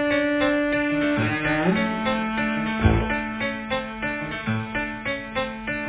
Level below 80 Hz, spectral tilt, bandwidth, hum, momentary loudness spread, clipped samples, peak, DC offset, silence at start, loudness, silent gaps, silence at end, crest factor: -38 dBFS; -10 dB/octave; 4 kHz; none; 7 LU; under 0.1%; -6 dBFS; under 0.1%; 0 s; -24 LUFS; none; 0 s; 18 dB